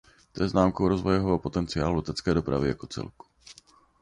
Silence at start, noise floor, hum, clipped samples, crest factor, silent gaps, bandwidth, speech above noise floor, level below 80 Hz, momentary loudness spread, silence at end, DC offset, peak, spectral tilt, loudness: 0.35 s; -56 dBFS; none; under 0.1%; 18 dB; none; 10.5 kHz; 30 dB; -44 dBFS; 13 LU; 0.5 s; under 0.1%; -8 dBFS; -7 dB/octave; -27 LUFS